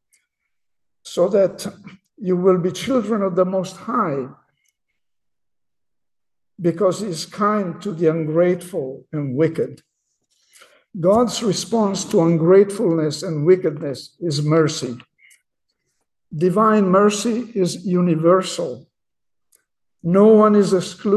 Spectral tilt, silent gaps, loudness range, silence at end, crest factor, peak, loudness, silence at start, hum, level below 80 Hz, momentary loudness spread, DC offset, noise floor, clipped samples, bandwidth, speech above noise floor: -6 dB/octave; none; 7 LU; 0 s; 16 dB; -2 dBFS; -19 LUFS; 1.05 s; none; -62 dBFS; 14 LU; under 0.1%; -88 dBFS; under 0.1%; 12.5 kHz; 70 dB